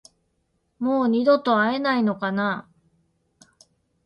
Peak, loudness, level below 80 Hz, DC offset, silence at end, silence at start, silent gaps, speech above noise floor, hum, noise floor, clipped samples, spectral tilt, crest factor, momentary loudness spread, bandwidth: -8 dBFS; -22 LUFS; -68 dBFS; under 0.1%; 1.45 s; 0.8 s; none; 50 dB; none; -71 dBFS; under 0.1%; -7 dB/octave; 18 dB; 8 LU; 10.5 kHz